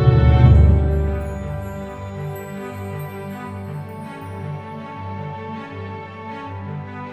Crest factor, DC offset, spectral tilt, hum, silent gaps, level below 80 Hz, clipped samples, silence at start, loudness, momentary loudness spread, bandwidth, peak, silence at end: 20 dB; under 0.1%; -9 dB/octave; 50 Hz at -45 dBFS; none; -24 dBFS; under 0.1%; 0 s; -22 LUFS; 19 LU; 13 kHz; 0 dBFS; 0 s